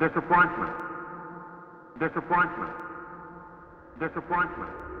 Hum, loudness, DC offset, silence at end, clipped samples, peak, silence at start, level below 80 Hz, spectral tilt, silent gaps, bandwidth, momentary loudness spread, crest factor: none; -28 LUFS; under 0.1%; 0 s; under 0.1%; -10 dBFS; 0 s; -56 dBFS; -8.5 dB/octave; none; 5.4 kHz; 24 LU; 20 dB